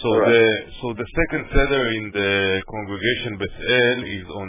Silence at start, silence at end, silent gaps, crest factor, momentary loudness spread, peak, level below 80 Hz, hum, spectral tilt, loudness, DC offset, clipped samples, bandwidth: 0 s; 0 s; none; 18 dB; 12 LU; -4 dBFS; -34 dBFS; none; -9 dB/octave; -20 LUFS; under 0.1%; under 0.1%; 3.8 kHz